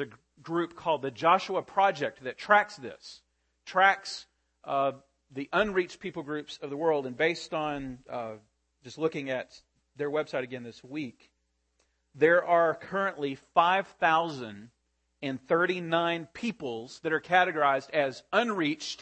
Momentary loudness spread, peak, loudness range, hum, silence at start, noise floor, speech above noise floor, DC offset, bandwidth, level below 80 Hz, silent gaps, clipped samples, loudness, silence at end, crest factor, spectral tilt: 16 LU; -6 dBFS; 8 LU; none; 0 s; -75 dBFS; 46 dB; under 0.1%; 8.8 kHz; -68 dBFS; none; under 0.1%; -29 LUFS; 0 s; 22 dB; -5 dB/octave